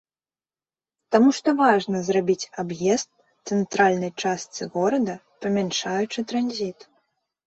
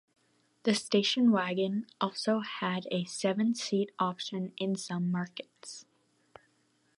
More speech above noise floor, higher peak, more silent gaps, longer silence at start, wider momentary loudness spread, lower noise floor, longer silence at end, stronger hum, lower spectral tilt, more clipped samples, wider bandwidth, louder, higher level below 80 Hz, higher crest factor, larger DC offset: first, over 68 dB vs 41 dB; first, -4 dBFS vs -12 dBFS; neither; first, 1.1 s vs 0.65 s; about the same, 11 LU vs 13 LU; first, under -90 dBFS vs -72 dBFS; second, 0.75 s vs 1.15 s; neither; about the same, -4.5 dB/octave vs -5 dB/octave; neither; second, 8.2 kHz vs 11.5 kHz; first, -23 LUFS vs -31 LUFS; first, -66 dBFS vs -82 dBFS; about the same, 20 dB vs 20 dB; neither